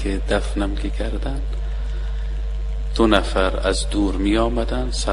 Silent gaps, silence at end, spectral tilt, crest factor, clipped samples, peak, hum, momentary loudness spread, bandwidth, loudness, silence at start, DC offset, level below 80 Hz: none; 0 s; -5.5 dB/octave; 20 dB; under 0.1%; 0 dBFS; none; 10 LU; 11 kHz; -22 LUFS; 0 s; under 0.1%; -24 dBFS